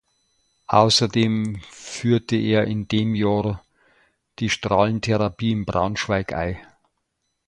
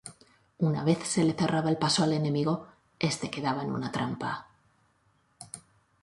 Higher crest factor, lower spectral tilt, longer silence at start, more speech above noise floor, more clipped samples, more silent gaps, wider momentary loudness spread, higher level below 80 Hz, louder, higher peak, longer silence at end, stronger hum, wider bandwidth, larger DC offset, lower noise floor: about the same, 22 dB vs 18 dB; about the same, -5.5 dB/octave vs -5 dB/octave; first, 0.7 s vs 0.05 s; first, 54 dB vs 41 dB; neither; neither; second, 12 LU vs 17 LU; first, -46 dBFS vs -64 dBFS; first, -21 LUFS vs -29 LUFS; first, 0 dBFS vs -12 dBFS; first, 0.85 s vs 0.45 s; neither; about the same, 11.5 kHz vs 11.5 kHz; neither; first, -75 dBFS vs -69 dBFS